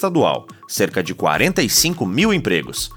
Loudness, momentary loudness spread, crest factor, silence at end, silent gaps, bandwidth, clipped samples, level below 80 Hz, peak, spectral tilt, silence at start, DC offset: -17 LUFS; 6 LU; 16 dB; 0 s; none; 20 kHz; under 0.1%; -44 dBFS; -2 dBFS; -3.5 dB/octave; 0 s; under 0.1%